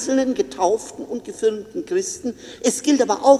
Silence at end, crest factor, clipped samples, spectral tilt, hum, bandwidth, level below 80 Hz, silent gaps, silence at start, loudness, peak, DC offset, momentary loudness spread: 0 s; 20 dB; under 0.1%; -3 dB/octave; none; 14.5 kHz; -60 dBFS; none; 0 s; -22 LUFS; 0 dBFS; under 0.1%; 12 LU